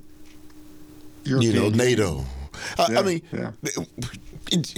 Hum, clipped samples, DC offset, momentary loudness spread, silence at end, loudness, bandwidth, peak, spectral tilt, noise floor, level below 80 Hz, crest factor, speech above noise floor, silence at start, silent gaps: none; under 0.1%; under 0.1%; 15 LU; 0 s; -24 LUFS; 19.5 kHz; -8 dBFS; -5 dB/octave; -43 dBFS; -44 dBFS; 16 dB; 20 dB; 0.05 s; none